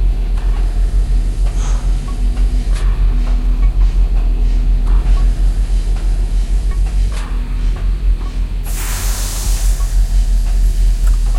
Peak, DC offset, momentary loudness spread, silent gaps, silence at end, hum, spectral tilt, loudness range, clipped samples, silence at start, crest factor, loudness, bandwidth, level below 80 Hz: -2 dBFS; under 0.1%; 4 LU; none; 0 s; none; -5 dB/octave; 3 LU; under 0.1%; 0 s; 10 dB; -18 LUFS; 16 kHz; -12 dBFS